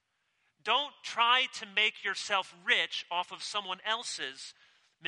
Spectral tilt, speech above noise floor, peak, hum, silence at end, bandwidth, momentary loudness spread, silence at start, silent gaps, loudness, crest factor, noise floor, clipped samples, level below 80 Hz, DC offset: 0.5 dB/octave; 44 dB; -10 dBFS; none; 0 s; 11 kHz; 12 LU; 0.65 s; none; -30 LUFS; 22 dB; -76 dBFS; under 0.1%; -90 dBFS; under 0.1%